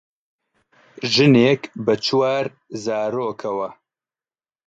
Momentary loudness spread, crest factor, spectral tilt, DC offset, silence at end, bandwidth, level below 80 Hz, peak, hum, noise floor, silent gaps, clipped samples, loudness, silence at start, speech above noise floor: 15 LU; 18 dB; -5.5 dB/octave; under 0.1%; 0.95 s; 8 kHz; -64 dBFS; -4 dBFS; none; under -90 dBFS; none; under 0.1%; -19 LUFS; 1 s; over 71 dB